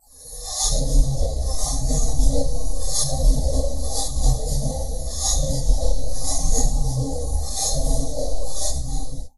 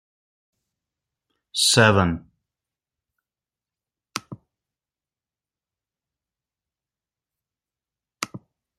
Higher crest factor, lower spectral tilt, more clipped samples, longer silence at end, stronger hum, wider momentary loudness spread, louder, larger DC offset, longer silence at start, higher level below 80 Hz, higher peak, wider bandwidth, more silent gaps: second, 16 dB vs 26 dB; about the same, -4 dB/octave vs -3.5 dB/octave; neither; second, 0 s vs 0.4 s; neither; second, 7 LU vs 19 LU; second, -24 LUFS vs -18 LUFS; first, 5% vs under 0.1%; second, 0 s vs 1.55 s; first, -22 dBFS vs -60 dBFS; about the same, -4 dBFS vs -2 dBFS; second, 12.5 kHz vs 16 kHz; neither